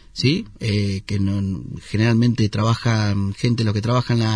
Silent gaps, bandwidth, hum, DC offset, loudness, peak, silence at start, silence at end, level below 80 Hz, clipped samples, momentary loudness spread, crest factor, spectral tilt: none; 10.5 kHz; none; under 0.1%; -21 LUFS; -4 dBFS; 0.15 s; 0 s; -46 dBFS; under 0.1%; 6 LU; 16 dB; -6.5 dB/octave